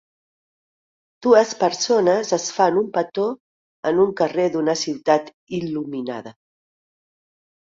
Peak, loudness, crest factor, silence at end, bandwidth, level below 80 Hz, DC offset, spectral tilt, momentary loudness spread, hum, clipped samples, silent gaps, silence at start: -2 dBFS; -20 LUFS; 20 dB; 1.35 s; 7.8 kHz; -66 dBFS; under 0.1%; -4 dB/octave; 12 LU; none; under 0.1%; 3.40-3.83 s, 5.34-5.47 s; 1.2 s